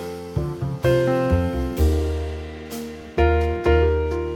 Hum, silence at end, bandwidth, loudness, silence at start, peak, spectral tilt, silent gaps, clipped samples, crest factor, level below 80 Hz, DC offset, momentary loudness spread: none; 0 s; 17 kHz; -22 LUFS; 0 s; -6 dBFS; -7.5 dB/octave; none; under 0.1%; 14 dB; -26 dBFS; under 0.1%; 14 LU